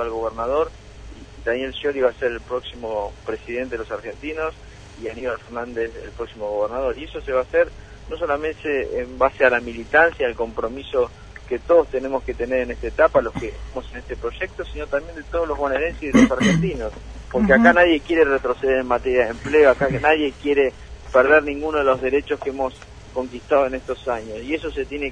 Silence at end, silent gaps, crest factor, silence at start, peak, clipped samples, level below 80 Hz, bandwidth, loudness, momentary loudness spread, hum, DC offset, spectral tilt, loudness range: 0 s; none; 22 dB; 0 s; 0 dBFS; under 0.1%; -40 dBFS; 10.5 kHz; -21 LUFS; 14 LU; none; under 0.1%; -6 dB/octave; 10 LU